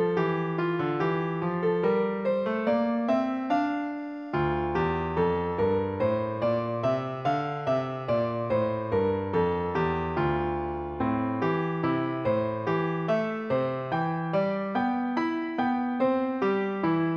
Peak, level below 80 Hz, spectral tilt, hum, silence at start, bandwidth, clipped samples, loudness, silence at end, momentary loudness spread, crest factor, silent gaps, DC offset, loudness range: -12 dBFS; -52 dBFS; -8.5 dB/octave; none; 0 s; 6.8 kHz; under 0.1%; -28 LUFS; 0 s; 3 LU; 16 dB; none; under 0.1%; 1 LU